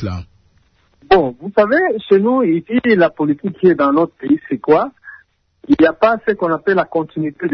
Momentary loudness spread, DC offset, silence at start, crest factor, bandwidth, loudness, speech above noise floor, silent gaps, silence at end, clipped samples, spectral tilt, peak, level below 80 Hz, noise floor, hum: 7 LU; under 0.1%; 0 s; 14 dB; 6.2 kHz; -15 LUFS; 41 dB; none; 0 s; under 0.1%; -8.5 dB/octave; -2 dBFS; -48 dBFS; -56 dBFS; none